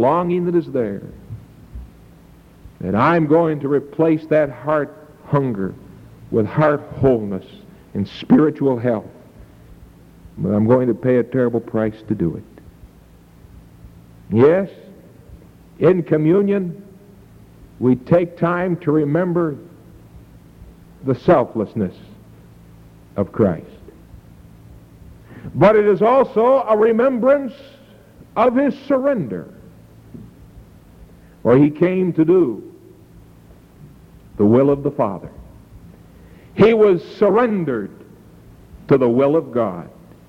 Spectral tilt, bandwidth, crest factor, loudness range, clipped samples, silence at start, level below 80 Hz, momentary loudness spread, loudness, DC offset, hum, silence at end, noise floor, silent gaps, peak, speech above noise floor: -9.5 dB/octave; 7.4 kHz; 16 dB; 6 LU; under 0.1%; 0 s; -48 dBFS; 16 LU; -17 LUFS; under 0.1%; none; 0.4 s; -46 dBFS; none; -2 dBFS; 30 dB